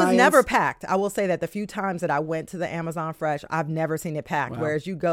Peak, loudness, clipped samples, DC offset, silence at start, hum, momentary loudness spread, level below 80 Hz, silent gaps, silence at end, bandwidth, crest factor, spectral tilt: -4 dBFS; -24 LUFS; under 0.1%; under 0.1%; 0 s; none; 12 LU; -56 dBFS; none; 0 s; 16.5 kHz; 20 dB; -5.5 dB/octave